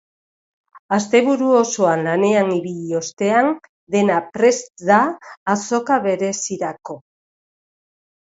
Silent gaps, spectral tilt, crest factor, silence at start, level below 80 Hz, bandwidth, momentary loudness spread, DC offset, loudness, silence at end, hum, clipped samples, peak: 0.79-0.89 s, 3.13-3.17 s, 3.69-3.87 s, 5.37-5.46 s; -4.5 dB/octave; 18 dB; 0.75 s; -66 dBFS; 8 kHz; 10 LU; under 0.1%; -18 LUFS; 1.4 s; none; under 0.1%; 0 dBFS